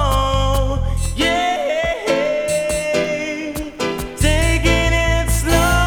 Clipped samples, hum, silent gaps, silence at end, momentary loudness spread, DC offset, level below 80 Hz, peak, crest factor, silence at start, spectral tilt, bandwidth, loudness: under 0.1%; none; none; 0 s; 8 LU; under 0.1%; -22 dBFS; -2 dBFS; 16 dB; 0 s; -4.5 dB/octave; 20 kHz; -18 LUFS